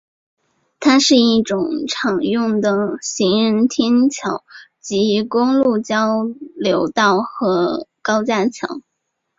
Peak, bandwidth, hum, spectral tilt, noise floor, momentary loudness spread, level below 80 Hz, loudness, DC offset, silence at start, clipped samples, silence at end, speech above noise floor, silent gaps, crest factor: -2 dBFS; 7.8 kHz; none; -4 dB/octave; -74 dBFS; 10 LU; -60 dBFS; -17 LUFS; under 0.1%; 0.8 s; under 0.1%; 0.6 s; 57 dB; none; 16 dB